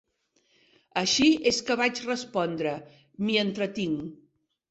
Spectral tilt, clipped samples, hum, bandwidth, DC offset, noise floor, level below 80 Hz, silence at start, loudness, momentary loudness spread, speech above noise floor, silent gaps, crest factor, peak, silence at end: -3.5 dB/octave; under 0.1%; none; 8.2 kHz; under 0.1%; -70 dBFS; -62 dBFS; 0.95 s; -26 LUFS; 12 LU; 44 dB; none; 18 dB; -10 dBFS; 0.55 s